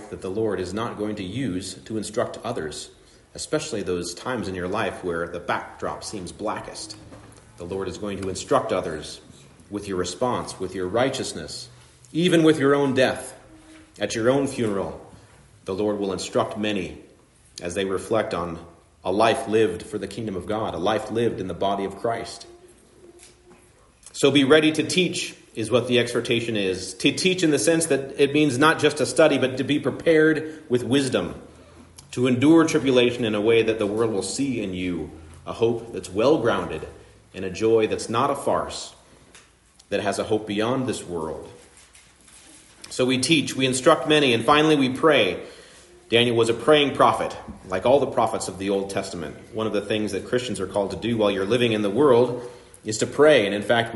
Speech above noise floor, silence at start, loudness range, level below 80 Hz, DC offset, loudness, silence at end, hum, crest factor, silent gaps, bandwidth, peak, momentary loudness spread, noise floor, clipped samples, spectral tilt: 33 dB; 0 s; 9 LU; -56 dBFS; under 0.1%; -23 LUFS; 0 s; none; 20 dB; none; 11.5 kHz; -4 dBFS; 16 LU; -55 dBFS; under 0.1%; -4.5 dB/octave